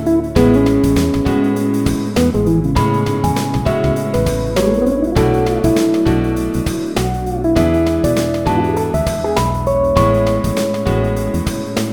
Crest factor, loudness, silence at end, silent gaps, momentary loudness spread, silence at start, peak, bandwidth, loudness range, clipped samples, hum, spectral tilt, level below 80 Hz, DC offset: 14 dB; -16 LUFS; 0 s; none; 6 LU; 0 s; 0 dBFS; 18 kHz; 2 LU; under 0.1%; none; -6.5 dB/octave; -26 dBFS; 0.6%